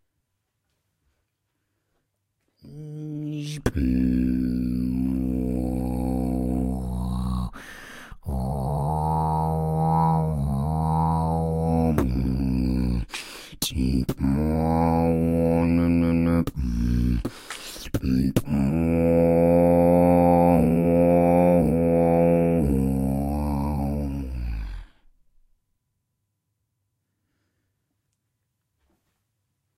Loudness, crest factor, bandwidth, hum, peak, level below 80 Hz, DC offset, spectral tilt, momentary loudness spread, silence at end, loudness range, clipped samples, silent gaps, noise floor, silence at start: -23 LUFS; 20 dB; 16 kHz; none; -4 dBFS; -34 dBFS; under 0.1%; -8 dB/octave; 14 LU; 4.9 s; 11 LU; under 0.1%; none; -78 dBFS; 2.65 s